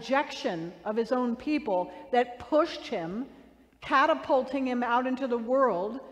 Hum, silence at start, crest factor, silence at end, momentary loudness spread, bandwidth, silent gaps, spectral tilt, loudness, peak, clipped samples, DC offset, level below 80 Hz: none; 0 s; 16 dB; 0 s; 9 LU; 10 kHz; none; -5.5 dB/octave; -28 LUFS; -12 dBFS; under 0.1%; under 0.1%; -64 dBFS